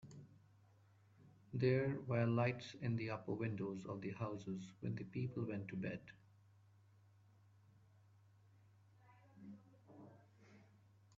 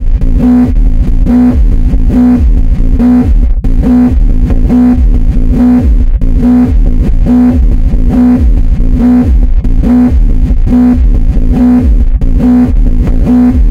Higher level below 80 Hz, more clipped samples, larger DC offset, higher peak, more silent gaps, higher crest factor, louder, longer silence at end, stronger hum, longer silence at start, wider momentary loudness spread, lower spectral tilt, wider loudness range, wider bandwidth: second, -76 dBFS vs -8 dBFS; neither; neither; second, -24 dBFS vs 0 dBFS; neither; first, 22 dB vs 6 dB; second, -43 LUFS vs -8 LUFS; first, 0.55 s vs 0 s; neither; about the same, 0.05 s vs 0 s; first, 24 LU vs 5 LU; second, -7 dB/octave vs -10 dB/octave; first, 24 LU vs 1 LU; first, 7.4 kHz vs 4.2 kHz